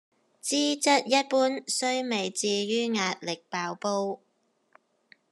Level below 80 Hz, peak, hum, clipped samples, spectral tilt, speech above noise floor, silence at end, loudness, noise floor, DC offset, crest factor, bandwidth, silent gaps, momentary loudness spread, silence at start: under -90 dBFS; -8 dBFS; none; under 0.1%; -2.5 dB/octave; 36 dB; 1.15 s; -27 LUFS; -64 dBFS; under 0.1%; 20 dB; 12.5 kHz; none; 10 LU; 0.45 s